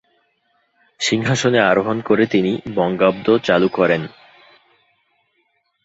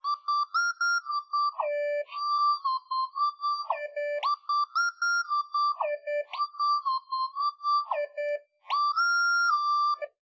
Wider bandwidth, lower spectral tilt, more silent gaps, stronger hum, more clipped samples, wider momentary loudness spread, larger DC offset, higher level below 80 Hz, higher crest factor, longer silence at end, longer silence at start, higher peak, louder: about the same, 8 kHz vs 7.4 kHz; first, -5 dB/octave vs 6 dB/octave; neither; neither; neither; about the same, 6 LU vs 8 LU; neither; first, -56 dBFS vs under -90 dBFS; first, 18 dB vs 12 dB; first, 1.75 s vs 0.15 s; first, 1 s vs 0.05 s; first, -2 dBFS vs -16 dBFS; first, -17 LUFS vs -28 LUFS